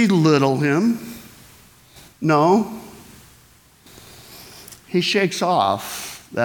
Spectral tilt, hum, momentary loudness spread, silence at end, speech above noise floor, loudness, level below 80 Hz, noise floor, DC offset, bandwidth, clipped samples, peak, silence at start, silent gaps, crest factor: -5.5 dB/octave; none; 24 LU; 0 s; 34 dB; -19 LUFS; -60 dBFS; -52 dBFS; under 0.1%; 19.5 kHz; under 0.1%; -4 dBFS; 0 s; none; 18 dB